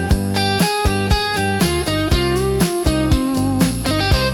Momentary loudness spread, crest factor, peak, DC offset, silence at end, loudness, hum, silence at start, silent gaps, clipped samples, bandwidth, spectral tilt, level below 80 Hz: 2 LU; 12 dB; -4 dBFS; under 0.1%; 0 s; -17 LUFS; none; 0 s; none; under 0.1%; 18 kHz; -5 dB/octave; -26 dBFS